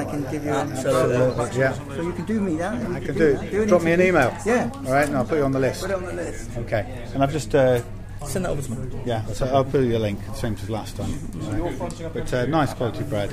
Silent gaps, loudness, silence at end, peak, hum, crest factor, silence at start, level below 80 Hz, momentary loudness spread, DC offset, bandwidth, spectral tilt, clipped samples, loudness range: none; -23 LUFS; 0 s; -4 dBFS; none; 18 dB; 0 s; -38 dBFS; 11 LU; under 0.1%; 15.5 kHz; -6 dB/octave; under 0.1%; 5 LU